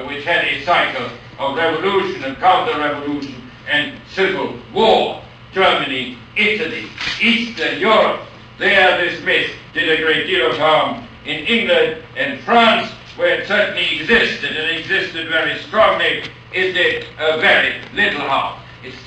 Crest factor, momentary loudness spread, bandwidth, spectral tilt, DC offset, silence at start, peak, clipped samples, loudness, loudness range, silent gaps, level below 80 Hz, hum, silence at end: 16 dB; 10 LU; 9.6 kHz; -4 dB/octave; under 0.1%; 0 s; -2 dBFS; under 0.1%; -16 LUFS; 3 LU; none; -50 dBFS; none; 0 s